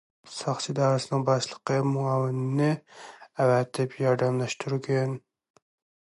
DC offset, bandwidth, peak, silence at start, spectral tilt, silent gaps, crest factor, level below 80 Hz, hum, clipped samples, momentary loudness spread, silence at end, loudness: under 0.1%; 11.5 kHz; -12 dBFS; 0.25 s; -6 dB/octave; none; 16 dB; -72 dBFS; none; under 0.1%; 10 LU; 0.9 s; -27 LUFS